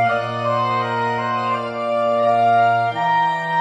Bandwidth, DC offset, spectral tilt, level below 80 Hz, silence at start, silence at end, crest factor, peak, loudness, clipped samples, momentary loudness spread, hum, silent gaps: 9.6 kHz; under 0.1%; -6 dB/octave; -64 dBFS; 0 s; 0 s; 12 dB; -6 dBFS; -18 LUFS; under 0.1%; 6 LU; none; none